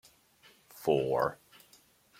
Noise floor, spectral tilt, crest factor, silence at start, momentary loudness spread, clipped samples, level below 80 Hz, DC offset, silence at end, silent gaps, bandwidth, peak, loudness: -64 dBFS; -6 dB/octave; 22 dB; 0.75 s; 25 LU; under 0.1%; -68 dBFS; under 0.1%; 0.85 s; none; 16.5 kHz; -14 dBFS; -31 LUFS